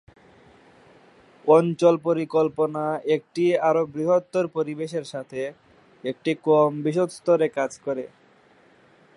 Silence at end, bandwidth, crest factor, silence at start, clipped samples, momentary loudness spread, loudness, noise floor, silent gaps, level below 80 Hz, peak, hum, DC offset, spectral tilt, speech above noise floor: 1.1 s; 11.5 kHz; 20 dB; 1.45 s; under 0.1%; 13 LU; -23 LUFS; -56 dBFS; none; -70 dBFS; -4 dBFS; none; under 0.1%; -6.5 dB/octave; 34 dB